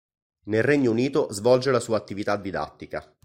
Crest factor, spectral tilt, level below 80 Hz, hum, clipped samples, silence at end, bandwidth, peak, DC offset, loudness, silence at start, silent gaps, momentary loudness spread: 18 dB; -5.5 dB/octave; -58 dBFS; none; under 0.1%; 0.25 s; 16 kHz; -6 dBFS; under 0.1%; -24 LUFS; 0.45 s; none; 12 LU